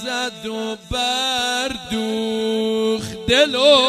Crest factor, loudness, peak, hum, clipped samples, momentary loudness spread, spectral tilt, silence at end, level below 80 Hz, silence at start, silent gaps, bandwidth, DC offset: 16 dB; -19 LUFS; -2 dBFS; none; under 0.1%; 10 LU; -3 dB/octave; 0 s; -44 dBFS; 0 s; none; 15.5 kHz; under 0.1%